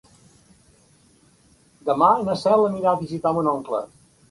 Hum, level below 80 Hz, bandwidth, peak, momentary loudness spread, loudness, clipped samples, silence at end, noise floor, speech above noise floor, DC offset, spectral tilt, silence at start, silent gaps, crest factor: none; -60 dBFS; 11.5 kHz; -4 dBFS; 11 LU; -21 LUFS; under 0.1%; 0.45 s; -57 dBFS; 37 dB; under 0.1%; -7 dB/octave; 1.85 s; none; 20 dB